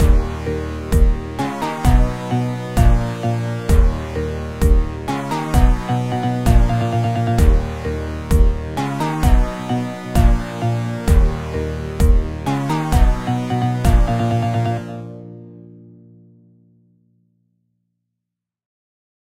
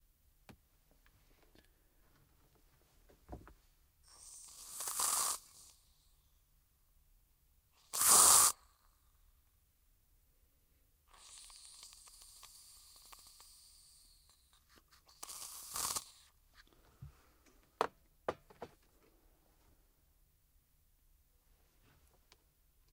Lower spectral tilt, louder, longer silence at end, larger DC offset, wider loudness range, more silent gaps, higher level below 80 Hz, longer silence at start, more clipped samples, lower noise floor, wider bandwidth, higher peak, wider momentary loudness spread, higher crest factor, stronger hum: first, -7 dB/octave vs 0.5 dB/octave; first, -19 LUFS vs -31 LUFS; second, 3.5 s vs 4.25 s; first, 0.4% vs under 0.1%; second, 3 LU vs 26 LU; neither; first, -20 dBFS vs -70 dBFS; second, 0 s vs 3.3 s; neither; first, -82 dBFS vs -73 dBFS; about the same, 15.5 kHz vs 16 kHz; first, 0 dBFS vs -10 dBFS; second, 8 LU vs 31 LU; second, 18 dB vs 32 dB; neither